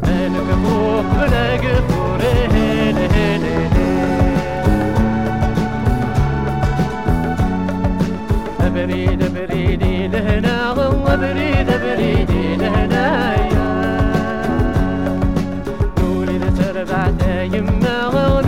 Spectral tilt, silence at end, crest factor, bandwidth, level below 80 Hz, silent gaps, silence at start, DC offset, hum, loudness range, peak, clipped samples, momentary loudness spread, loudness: -7.5 dB/octave; 0 s; 14 dB; 16 kHz; -24 dBFS; none; 0 s; 2%; none; 2 LU; 0 dBFS; under 0.1%; 3 LU; -17 LUFS